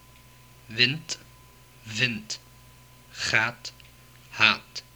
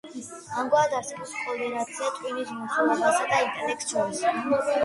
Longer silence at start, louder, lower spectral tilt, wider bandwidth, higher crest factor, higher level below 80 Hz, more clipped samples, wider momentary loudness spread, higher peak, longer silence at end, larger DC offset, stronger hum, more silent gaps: first, 0.7 s vs 0.05 s; about the same, -25 LUFS vs -26 LUFS; about the same, -2.5 dB/octave vs -3 dB/octave; first, over 20 kHz vs 11.5 kHz; first, 28 dB vs 16 dB; first, -60 dBFS vs -70 dBFS; neither; first, 20 LU vs 10 LU; first, -2 dBFS vs -10 dBFS; first, 0.15 s vs 0 s; neither; neither; neither